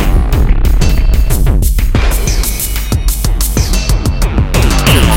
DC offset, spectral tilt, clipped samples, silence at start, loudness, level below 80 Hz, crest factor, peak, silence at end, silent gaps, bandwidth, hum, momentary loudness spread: under 0.1%; -4.5 dB/octave; 0.5%; 0 s; -13 LUFS; -10 dBFS; 10 dB; 0 dBFS; 0 s; none; 17 kHz; none; 4 LU